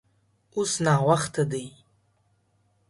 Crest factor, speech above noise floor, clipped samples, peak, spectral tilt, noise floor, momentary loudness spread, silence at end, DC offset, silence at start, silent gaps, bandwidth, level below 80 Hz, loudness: 20 dB; 44 dB; under 0.1%; -8 dBFS; -5 dB/octave; -68 dBFS; 14 LU; 1.2 s; under 0.1%; 0.55 s; none; 11.5 kHz; -62 dBFS; -25 LUFS